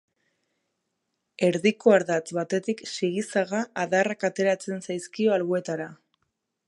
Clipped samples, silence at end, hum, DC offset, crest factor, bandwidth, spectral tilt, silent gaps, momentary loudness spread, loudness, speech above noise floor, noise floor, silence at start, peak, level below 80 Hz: under 0.1%; 0.75 s; none; under 0.1%; 20 dB; 11.5 kHz; -5 dB/octave; none; 11 LU; -25 LUFS; 54 dB; -79 dBFS; 1.4 s; -6 dBFS; -76 dBFS